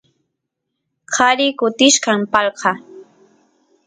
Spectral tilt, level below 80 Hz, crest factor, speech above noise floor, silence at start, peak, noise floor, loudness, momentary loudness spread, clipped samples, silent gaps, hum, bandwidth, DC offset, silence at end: -1.5 dB/octave; -62 dBFS; 18 dB; 62 dB; 1.1 s; 0 dBFS; -77 dBFS; -15 LUFS; 9 LU; under 0.1%; none; none; 9.6 kHz; under 0.1%; 0.85 s